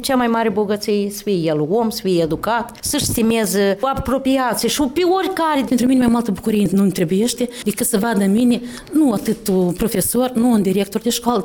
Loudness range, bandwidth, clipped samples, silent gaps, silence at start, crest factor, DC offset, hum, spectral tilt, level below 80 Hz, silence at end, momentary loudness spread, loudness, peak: 1 LU; 19.5 kHz; under 0.1%; none; 0 s; 16 dB; under 0.1%; none; -5 dB/octave; -42 dBFS; 0 s; 4 LU; -18 LUFS; -2 dBFS